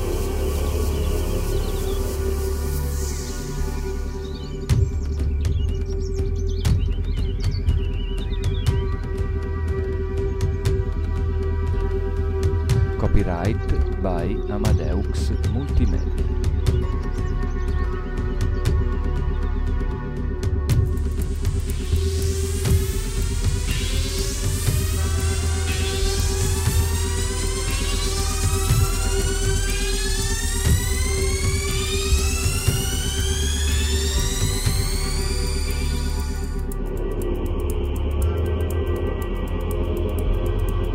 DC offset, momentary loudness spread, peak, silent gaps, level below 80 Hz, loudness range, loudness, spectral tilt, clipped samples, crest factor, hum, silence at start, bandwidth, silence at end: under 0.1%; 5 LU; -4 dBFS; none; -24 dBFS; 4 LU; -24 LUFS; -5 dB/octave; under 0.1%; 18 dB; none; 0 s; 16 kHz; 0 s